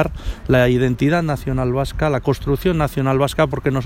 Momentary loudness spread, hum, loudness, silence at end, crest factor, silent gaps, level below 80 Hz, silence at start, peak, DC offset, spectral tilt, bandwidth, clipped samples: 5 LU; none; -18 LUFS; 0 s; 16 dB; none; -32 dBFS; 0 s; 0 dBFS; under 0.1%; -7 dB/octave; 16.5 kHz; under 0.1%